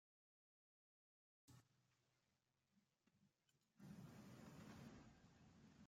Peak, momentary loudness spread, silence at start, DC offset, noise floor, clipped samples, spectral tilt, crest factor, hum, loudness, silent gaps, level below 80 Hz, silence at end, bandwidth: -50 dBFS; 4 LU; 1.45 s; under 0.1%; -89 dBFS; under 0.1%; -5.5 dB/octave; 18 dB; none; -63 LUFS; none; -86 dBFS; 0 s; 16 kHz